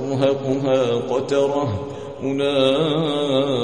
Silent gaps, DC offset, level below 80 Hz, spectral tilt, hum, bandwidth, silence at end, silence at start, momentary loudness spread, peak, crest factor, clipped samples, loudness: none; 0.4%; -52 dBFS; -6 dB/octave; none; 9.8 kHz; 0 s; 0 s; 8 LU; -4 dBFS; 16 dB; under 0.1%; -20 LUFS